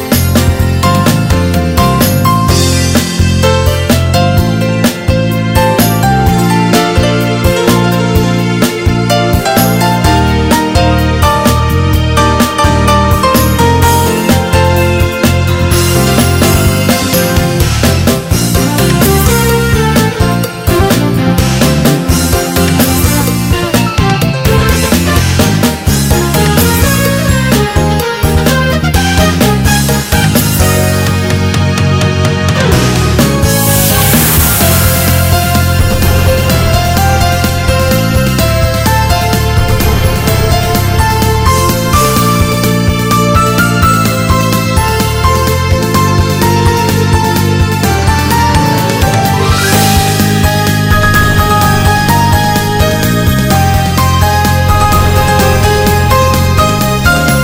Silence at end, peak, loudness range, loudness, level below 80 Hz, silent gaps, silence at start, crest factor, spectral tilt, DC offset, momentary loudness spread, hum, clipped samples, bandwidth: 0 s; 0 dBFS; 1 LU; -9 LUFS; -18 dBFS; none; 0 s; 8 dB; -5 dB/octave; under 0.1%; 3 LU; none; 0.8%; 19.5 kHz